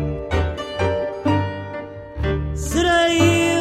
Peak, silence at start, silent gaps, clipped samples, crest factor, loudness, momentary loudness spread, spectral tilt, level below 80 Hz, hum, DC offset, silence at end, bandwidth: -4 dBFS; 0 s; none; under 0.1%; 16 dB; -20 LUFS; 14 LU; -5 dB/octave; -32 dBFS; none; under 0.1%; 0 s; 15 kHz